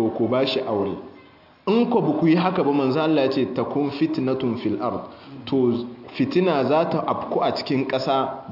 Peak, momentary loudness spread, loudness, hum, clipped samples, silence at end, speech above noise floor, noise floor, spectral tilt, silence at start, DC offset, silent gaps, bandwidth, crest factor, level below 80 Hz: -6 dBFS; 9 LU; -22 LUFS; none; under 0.1%; 0 s; 28 dB; -49 dBFS; -8 dB/octave; 0 s; under 0.1%; none; 5.8 kHz; 16 dB; -64 dBFS